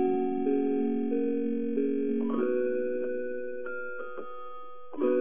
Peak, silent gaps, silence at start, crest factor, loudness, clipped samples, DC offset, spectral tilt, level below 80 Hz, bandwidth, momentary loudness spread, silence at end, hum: -14 dBFS; none; 0 s; 14 dB; -30 LUFS; under 0.1%; 1%; -6.5 dB/octave; -72 dBFS; 3.6 kHz; 14 LU; 0 s; none